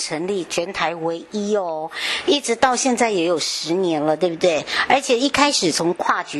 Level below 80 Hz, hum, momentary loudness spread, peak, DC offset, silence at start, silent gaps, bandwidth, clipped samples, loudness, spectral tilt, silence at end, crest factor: -56 dBFS; none; 8 LU; -2 dBFS; under 0.1%; 0 s; none; 12.5 kHz; under 0.1%; -19 LUFS; -3 dB/octave; 0 s; 18 dB